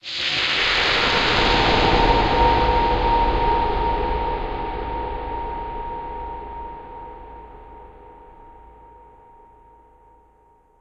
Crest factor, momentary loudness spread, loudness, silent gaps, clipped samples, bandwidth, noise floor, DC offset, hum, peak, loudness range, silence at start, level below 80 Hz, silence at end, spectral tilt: 18 dB; 20 LU; -20 LUFS; none; under 0.1%; 8.2 kHz; -56 dBFS; 0.3%; none; -4 dBFS; 20 LU; 0.05 s; -30 dBFS; 1.8 s; -4.5 dB/octave